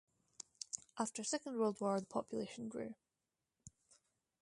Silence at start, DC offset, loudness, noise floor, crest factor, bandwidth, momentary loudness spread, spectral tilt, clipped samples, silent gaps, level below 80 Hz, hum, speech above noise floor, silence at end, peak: 0.75 s; under 0.1%; -42 LUFS; under -90 dBFS; 22 dB; 11.5 kHz; 23 LU; -4 dB/octave; under 0.1%; none; -80 dBFS; none; over 49 dB; 0.7 s; -22 dBFS